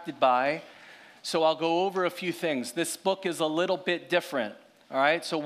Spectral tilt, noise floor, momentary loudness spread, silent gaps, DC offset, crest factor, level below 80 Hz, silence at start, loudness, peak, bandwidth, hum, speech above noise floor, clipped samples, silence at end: -3.5 dB/octave; -51 dBFS; 8 LU; none; under 0.1%; 18 dB; -88 dBFS; 0 s; -28 LUFS; -10 dBFS; 15.5 kHz; none; 24 dB; under 0.1%; 0 s